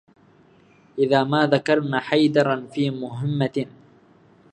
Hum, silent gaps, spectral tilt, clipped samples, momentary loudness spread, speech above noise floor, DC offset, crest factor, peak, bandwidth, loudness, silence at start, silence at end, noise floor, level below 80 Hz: none; none; -7 dB/octave; under 0.1%; 9 LU; 34 dB; under 0.1%; 20 dB; -2 dBFS; 9.2 kHz; -21 LUFS; 0.95 s; 0.85 s; -54 dBFS; -68 dBFS